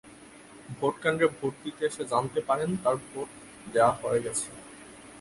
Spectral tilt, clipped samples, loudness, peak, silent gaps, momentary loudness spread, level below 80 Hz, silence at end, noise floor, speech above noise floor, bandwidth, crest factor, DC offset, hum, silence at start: -4.5 dB/octave; under 0.1%; -29 LUFS; -8 dBFS; none; 22 LU; -64 dBFS; 0 s; -50 dBFS; 22 dB; 11.5 kHz; 20 dB; under 0.1%; none; 0.05 s